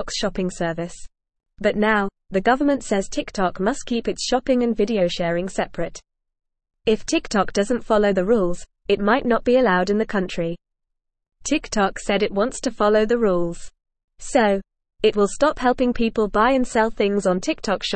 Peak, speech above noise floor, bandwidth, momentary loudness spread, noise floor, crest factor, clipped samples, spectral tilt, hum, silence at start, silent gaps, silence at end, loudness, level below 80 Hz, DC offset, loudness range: -4 dBFS; 58 dB; 8.8 kHz; 8 LU; -78 dBFS; 18 dB; under 0.1%; -4.5 dB/octave; none; 0 s; 14.04-14.08 s; 0 s; -21 LUFS; -42 dBFS; 0.4%; 3 LU